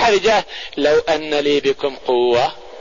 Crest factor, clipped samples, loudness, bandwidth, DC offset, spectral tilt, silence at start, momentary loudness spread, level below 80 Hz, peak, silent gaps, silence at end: 12 dB; under 0.1%; -17 LUFS; 7.4 kHz; 1%; -3.5 dB/octave; 0 s; 6 LU; -46 dBFS; -6 dBFS; none; 0 s